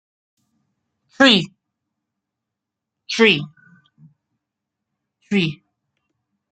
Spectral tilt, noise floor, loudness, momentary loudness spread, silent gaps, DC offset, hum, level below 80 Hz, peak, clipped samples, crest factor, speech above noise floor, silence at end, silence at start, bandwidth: -4.5 dB/octave; -83 dBFS; -16 LUFS; 16 LU; none; under 0.1%; none; -64 dBFS; 0 dBFS; under 0.1%; 24 dB; 67 dB; 1 s; 1.2 s; 9.2 kHz